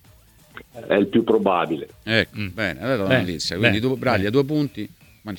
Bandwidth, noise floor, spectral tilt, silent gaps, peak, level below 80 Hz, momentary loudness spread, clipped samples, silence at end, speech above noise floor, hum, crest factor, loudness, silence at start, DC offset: 19 kHz; -52 dBFS; -6 dB/octave; none; -2 dBFS; -52 dBFS; 14 LU; under 0.1%; 0 s; 31 dB; none; 20 dB; -21 LUFS; 0.55 s; under 0.1%